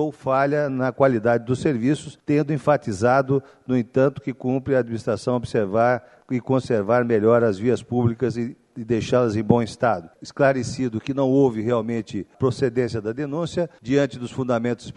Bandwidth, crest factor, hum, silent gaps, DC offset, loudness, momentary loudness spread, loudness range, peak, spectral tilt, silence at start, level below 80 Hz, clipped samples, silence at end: 11 kHz; 20 dB; none; none; under 0.1%; -22 LUFS; 8 LU; 2 LU; -2 dBFS; -7 dB/octave; 0 s; -56 dBFS; under 0.1%; 0.05 s